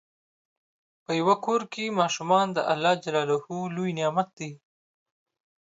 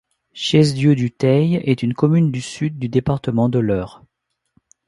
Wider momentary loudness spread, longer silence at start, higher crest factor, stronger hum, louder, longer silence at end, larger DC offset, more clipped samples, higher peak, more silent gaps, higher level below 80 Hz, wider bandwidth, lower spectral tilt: about the same, 8 LU vs 9 LU; first, 1.1 s vs 0.35 s; about the same, 20 dB vs 18 dB; neither; second, -26 LUFS vs -18 LUFS; about the same, 1.05 s vs 1 s; neither; neither; second, -8 dBFS vs 0 dBFS; first, 4.33-4.37 s vs none; second, -76 dBFS vs -48 dBFS; second, 8 kHz vs 11.5 kHz; second, -5 dB/octave vs -7 dB/octave